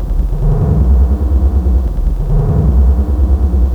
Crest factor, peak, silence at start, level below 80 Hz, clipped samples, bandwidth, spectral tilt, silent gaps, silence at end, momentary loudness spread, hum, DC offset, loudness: 10 dB; 0 dBFS; 0 s; -12 dBFS; under 0.1%; 1.9 kHz; -10.5 dB/octave; none; 0 s; 5 LU; none; under 0.1%; -13 LUFS